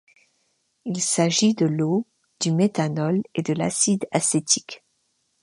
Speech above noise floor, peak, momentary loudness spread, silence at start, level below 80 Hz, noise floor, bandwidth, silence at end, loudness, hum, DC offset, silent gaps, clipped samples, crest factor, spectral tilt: 48 dB; -4 dBFS; 11 LU; 0.85 s; -68 dBFS; -70 dBFS; 11.5 kHz; 0.65 s; -22 LUFS; none; under 0.1%; none; under 0.1%; 20 dB; -4 dB/octave